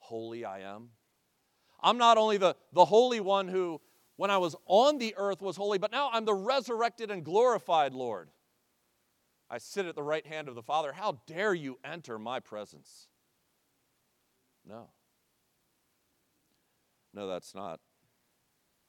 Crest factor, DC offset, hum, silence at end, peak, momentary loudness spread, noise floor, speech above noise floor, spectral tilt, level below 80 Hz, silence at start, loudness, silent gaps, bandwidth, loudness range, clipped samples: 24 dB; under 0.1%; none; 1.15 s; -8 dBFS; 19 LU; -76 dBFS; 46 dB; -4 dB/octave; under -90 dBFS; 0.1 s; -29 LUFS; none; 16 kHz; 20 LU; under 0.1%